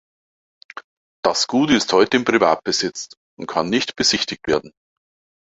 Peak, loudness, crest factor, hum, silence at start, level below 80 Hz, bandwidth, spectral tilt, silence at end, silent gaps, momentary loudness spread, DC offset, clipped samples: -2 dBFS; -18 LUFS; 20 dB; none; 0.75 s; -54 dBFS; 8.2 kHz; -3 dB/octave; 0.8 s; 0.84-1.23 s, 3.17-3.37 s; 20 LU; under 0.1%; under 0.1%